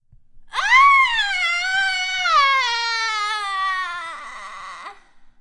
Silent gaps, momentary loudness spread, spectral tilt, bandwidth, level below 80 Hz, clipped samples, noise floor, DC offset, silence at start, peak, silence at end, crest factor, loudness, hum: none; 21 LU; 2.5 dB/octave; 11.5 kHz; -52 dBFS; under 0.1%; -46 dBFS; under 0.1%; 0.35 s; -4 dBFS; 0.15 s; 18 dB; -17 LUFS; none